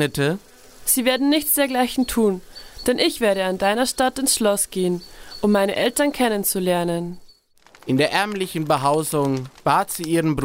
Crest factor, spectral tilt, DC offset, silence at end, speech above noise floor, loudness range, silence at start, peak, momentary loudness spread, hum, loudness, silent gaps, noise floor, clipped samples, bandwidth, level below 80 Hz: 18 dB; -4 dB/octave; under 0.1%; 0 s; 32 dB; 2 LU; 0 s; -4 dBFS; 8 LU; none; -20 LUFS; none; -53 dBFS; under 0.1%; 16.5 kHz; -48 dBFS